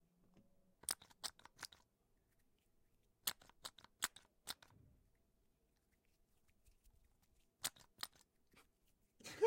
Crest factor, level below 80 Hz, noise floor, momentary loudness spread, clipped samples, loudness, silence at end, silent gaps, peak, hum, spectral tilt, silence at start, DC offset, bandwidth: 32 dB; -80 dBFS; -81 dBFS; 10 LU; under 0.1%; -49 LUFS; 0 s; none; -22 dBFS; none; -0.5 dB/octave; 0.9 s; under 0.1%; 16.5 kHz